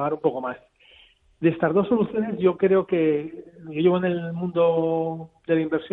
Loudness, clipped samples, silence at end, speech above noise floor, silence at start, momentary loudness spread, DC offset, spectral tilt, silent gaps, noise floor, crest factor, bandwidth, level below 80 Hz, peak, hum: -23 LUFS; under 0.1%; 0.05 s; 33 dB; 0 s; 13 LU; under 0.1%; -10.5 dB/octave; none; -55 dBFS; 16 dB; 4 kHz; -62 dBFS; -6 dBFS; none